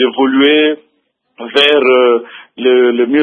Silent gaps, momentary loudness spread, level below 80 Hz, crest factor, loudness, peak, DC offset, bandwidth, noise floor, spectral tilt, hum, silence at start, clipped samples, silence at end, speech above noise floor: none; 8 LU; -66 dBFS; 12 dB; -10 LUFS; 0 dBFS; under 0.1%; 7.2 kHz; -63 dBFS; -4.5 dB/octave; none; 0 s; under 0.1%; 0 s; 53 dB